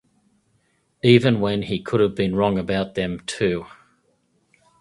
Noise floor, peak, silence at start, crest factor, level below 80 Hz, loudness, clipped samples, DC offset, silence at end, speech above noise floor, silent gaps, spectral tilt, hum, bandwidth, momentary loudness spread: -66 dBFS; 0 dBFS; 1.05 s; 22 dB; -50 dBFS; -21 LUFS; under 0.1%; under 0.1%; 1.15 s; 46 dB; none; -6.5 dB/octave; none; 11.5 kHz; 10 LU